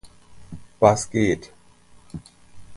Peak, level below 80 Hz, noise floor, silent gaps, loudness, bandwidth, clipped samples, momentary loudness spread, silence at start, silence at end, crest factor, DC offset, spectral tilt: -2 dBFS; -50 dBFS; -51 dBFS; none; -21 LUFS; 11.5 kHz; under 0.1%; 25 LU; 0.05 s; 0 s; 24 dB; under 0.1%; -5.5 dB/octave